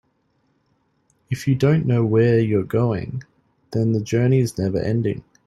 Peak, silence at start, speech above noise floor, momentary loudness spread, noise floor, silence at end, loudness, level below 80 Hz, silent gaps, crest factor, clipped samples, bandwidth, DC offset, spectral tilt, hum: -6 dBFS; 1.3 s; 47 dB; 10 LU; -66 dBFS; 0.25 s; -20 LUFS; -52 dBFS; none; 16 dB; under 0.1%; 13 kHz; under 0.1%; -8 dB/octave; none